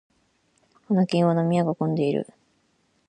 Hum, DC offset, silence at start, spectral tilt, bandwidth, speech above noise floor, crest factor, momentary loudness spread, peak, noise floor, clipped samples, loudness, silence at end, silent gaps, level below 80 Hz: none; under 0.1%; 0.9 s; -8 dB/octave; 9.6 kHz; 45 dB; 16 dB; 7 LU; -8 dBFS; -67 dBFS; under 0.1%; -23 LUFS; 0.85 s; none; -70 dBFS